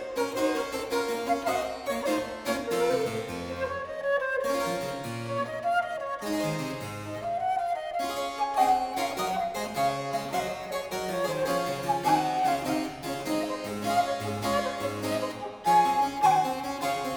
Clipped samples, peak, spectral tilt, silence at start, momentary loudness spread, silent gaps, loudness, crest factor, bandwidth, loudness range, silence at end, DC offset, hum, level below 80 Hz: under 0.1%; -12 dBFS; -4 dB/octave; 0 s; 9 LU; none; -29 LUFS; 18 dB; over 20 kHz; 3 LU; 0 s; under 0.1%; none; -58 dBFS